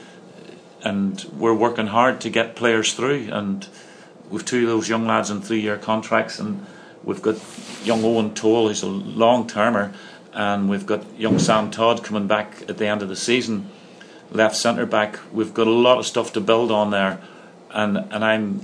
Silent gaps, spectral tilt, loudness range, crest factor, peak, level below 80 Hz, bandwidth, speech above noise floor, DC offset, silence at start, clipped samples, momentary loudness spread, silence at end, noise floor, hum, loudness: none; -4.5 dB/octave; 3 LU; 20 dB; -2 dBFS; -68 dBFS; 11 kHz; 23 dB; under 0.1%; 0 s; under 0.1%; 12 LU; 0 s; -43 dBFS; none; -21 LUFS